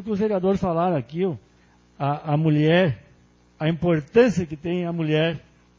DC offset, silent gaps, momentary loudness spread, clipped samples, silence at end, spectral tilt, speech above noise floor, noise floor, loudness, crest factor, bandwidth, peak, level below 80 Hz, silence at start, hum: under 0.1%; none; 9 LU; under 0.1%; 0.4 s; -7.5 dB/octave; 35 dB; -56 dBFS; -22 LUFS; 18 dB; 7.6 kHz; -4 dBFS; -52 dBFS; 0 s; none